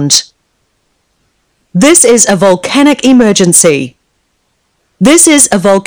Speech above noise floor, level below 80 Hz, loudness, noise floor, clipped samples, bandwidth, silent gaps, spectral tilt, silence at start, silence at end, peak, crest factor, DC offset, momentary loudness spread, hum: 53 dB; -46 dBFS; -6 LUFS; -59 dBFS; 3%; over 20 kHz; none; -3 dB/octave; 0 s; 0.05 s; 0 dBFS; 8 dB; under 0.1%; 7 LU; none